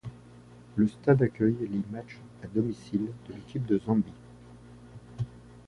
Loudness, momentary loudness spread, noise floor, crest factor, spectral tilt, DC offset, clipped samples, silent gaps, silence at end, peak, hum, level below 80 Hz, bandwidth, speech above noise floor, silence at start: -30 LUFS; 24 LU; -51 dBFS; 22 dB; -9.5 dB/octave; under 0.1%; under 0.1%; none; 0.1 s; -10 dBFS; 60 Hz at -50 dBFS; -58 dBFS; 10.5 kHz; 23 dB; 0.05 s